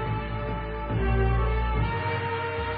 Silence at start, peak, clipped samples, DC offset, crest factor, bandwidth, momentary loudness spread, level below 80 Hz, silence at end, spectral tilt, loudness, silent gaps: 0 s; -12 dBFS; under 0.1%; under 0.1%; 14 dB; 4.9 kHz; 7 LU; -30 dBFS; 0 s; -11 dB/octave; -28 LUFS; none